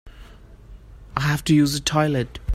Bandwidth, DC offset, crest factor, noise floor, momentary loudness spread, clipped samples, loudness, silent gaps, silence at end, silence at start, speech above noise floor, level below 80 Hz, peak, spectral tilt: 16 kHz; under 0.1%; 18 dB; -44 dBFS; 8 LU; under 0.1%; -21 LUFS; none; 0 s; 0.05 s; 24 dB; -42 dBFS; -4 dBFS; -5 dB/octave